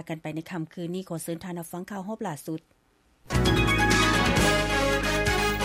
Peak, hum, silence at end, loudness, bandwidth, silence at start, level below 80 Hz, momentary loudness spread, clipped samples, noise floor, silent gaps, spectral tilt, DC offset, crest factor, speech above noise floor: -10 dBFS; none; 0 s; -26 LUFS; 16 kHz; 0 s; -36 dBFS; 15 LU; under 0.1%; -65 dBFS; none; -4 dB/octave; under 0.1%; 18 dB; 31 dB